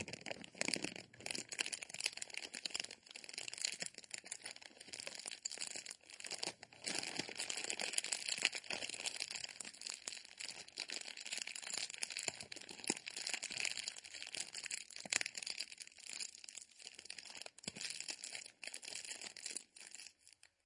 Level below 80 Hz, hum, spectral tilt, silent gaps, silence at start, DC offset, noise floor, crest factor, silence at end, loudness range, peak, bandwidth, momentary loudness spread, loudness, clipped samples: -88 dBFS; none; 0 dB/octave; none; 0 s; under 0.1%; -68 dBFS; 34 dB; 0.35 s; 6 LU; -12 dBFS; 11.5 kHz; 12 LU; -44 LUFS; under 0.1%